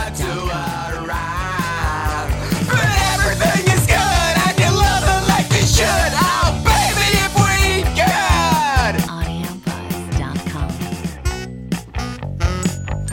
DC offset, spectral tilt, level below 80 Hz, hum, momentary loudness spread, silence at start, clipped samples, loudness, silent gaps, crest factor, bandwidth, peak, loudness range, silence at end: under 0.1%; -4 dB/octave; -24 dBFS; none; 11 LU; 0 s; under 0.1%; -17 LUFS; none; 16 dB; 17 kHz; -2 dBFS; 9 LU; 0 s